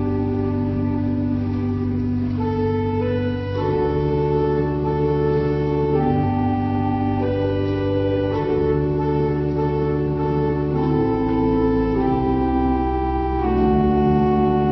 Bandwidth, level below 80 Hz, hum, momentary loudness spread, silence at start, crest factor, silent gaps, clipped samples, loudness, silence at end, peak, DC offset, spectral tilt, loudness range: 6 kHz; -32 dBFS; none; 4 LU; 0 s; 12 dB; none; under 0.1%; -20 LUFS; 0 s; -6 dBFS; under 0.1%; -10.5 dB/octave; 2 LU